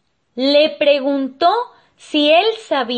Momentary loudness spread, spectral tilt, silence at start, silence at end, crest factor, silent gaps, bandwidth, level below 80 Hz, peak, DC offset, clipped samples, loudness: 9 LU; -3.5 dB/octave; 0.35 s; 0 s; 14 dB; none; 8.8 kHz; -70 dBFS; -2 dBFS; under 0.1%; under 0.1%; -15 LUFS